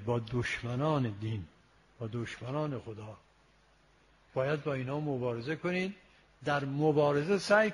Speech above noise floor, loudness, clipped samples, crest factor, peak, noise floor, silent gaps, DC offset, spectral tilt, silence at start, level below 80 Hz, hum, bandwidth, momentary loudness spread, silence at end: 34 dB; -33 LUFS; under 0.1%; 22 dB; -10 dBFS; -66 dBFS; none; under 0.1%; -6.5 dB/octave; 0 s; -62 dBFS; none; 11.5 kHz; 14 LU; 0 s